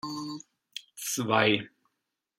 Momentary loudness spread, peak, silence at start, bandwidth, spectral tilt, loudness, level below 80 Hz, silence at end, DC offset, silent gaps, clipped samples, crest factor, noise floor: 20 LU; -8 dBFS; 0.05 s; 16 kHz; -3.5 dB/octave; -28 LUFS; -74 dBFS; 0.7 s; under 0.1%; none; under 0.1%; 24 dB; -83 dBFS